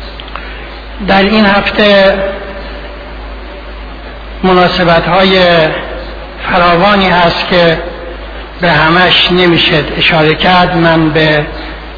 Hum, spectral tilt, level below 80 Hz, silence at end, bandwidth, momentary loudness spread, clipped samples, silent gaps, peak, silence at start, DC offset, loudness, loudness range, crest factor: none; -7 dB/octave; -26 dBFS; 0 s; 5.4 kHz; 20 LU; 0.4%; none; 0 dBFS; 0 s; under 0.1%; -8 LUFS; 4 LU; 10 dB